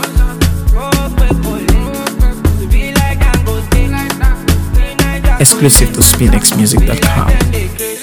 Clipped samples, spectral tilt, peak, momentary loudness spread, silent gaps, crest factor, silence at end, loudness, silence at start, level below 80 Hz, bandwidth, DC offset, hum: 0.7%; -4 dB/octave; 0 dBFS; 8 LU; none; 10 dB; 0 s; -11 LUFS; 0 s; -12 dBFS; over 20 kHz; under 0.1%; none